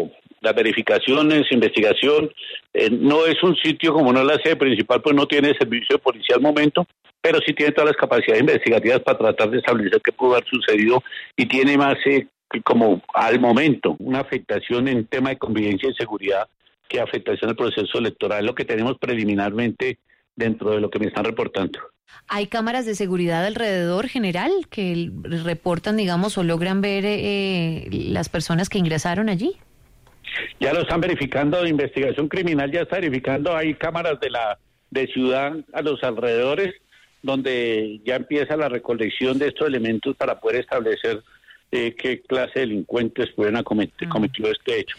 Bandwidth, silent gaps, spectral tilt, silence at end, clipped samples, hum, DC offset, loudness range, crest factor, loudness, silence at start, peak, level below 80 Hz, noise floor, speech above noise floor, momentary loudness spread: 13 kHz; none; -6 dB/octave; 0.05 s; under 0.1%; none; under 0.1%; 6 LU; 16 dB; -20 LUFS; 0 s; -4 dBFS; -54 dBFS; -53 dBFS; 32 dB; 9 LU